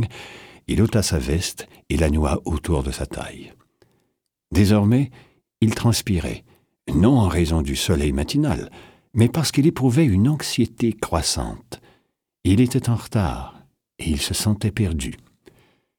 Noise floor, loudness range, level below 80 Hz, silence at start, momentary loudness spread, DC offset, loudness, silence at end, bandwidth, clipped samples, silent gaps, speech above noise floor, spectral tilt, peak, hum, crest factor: -73 dBFS; 4 LU; -34 dBFS; 0 s; 16 LU; under 0.1%; -21 LUFS; 0.85 s; 18.5 kHz; under 0.1%; none; 53 dB; -5.5 dB/octave; -4 dBFS; none; 18 dB